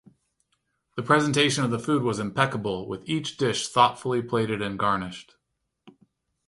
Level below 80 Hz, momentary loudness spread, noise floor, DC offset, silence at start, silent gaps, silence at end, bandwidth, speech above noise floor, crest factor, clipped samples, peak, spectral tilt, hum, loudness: -60 dBFS; 10 LU; -75 dBFS; under 0.1%; 0.95 s; none; 0.6 s; 11.5 kHz; 50 dB; 22 dB; under 0.1%; -4 dBFS; -4.5 dB/octave; none; -25 LUFS